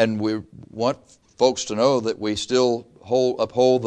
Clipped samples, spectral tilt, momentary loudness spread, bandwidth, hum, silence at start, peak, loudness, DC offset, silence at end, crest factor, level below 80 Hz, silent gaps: under 0.1%; -4.5 dB/octave; 9 LU; 10 kHz; none; 0 s; -2 dBFS; -22 LUFS; under 0.1%; 0 s; 18 dB; -58 dBFS; none